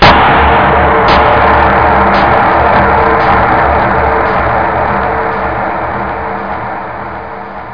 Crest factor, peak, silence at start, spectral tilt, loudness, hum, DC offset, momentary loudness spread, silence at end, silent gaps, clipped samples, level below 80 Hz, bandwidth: 10 dB; 0 dBFS; 0 s; -7 dB/octave; -9 LUFS; none; 2%; 12 LU; 0 s; none; 0.3%; -22 dBFS; 5.4 kHz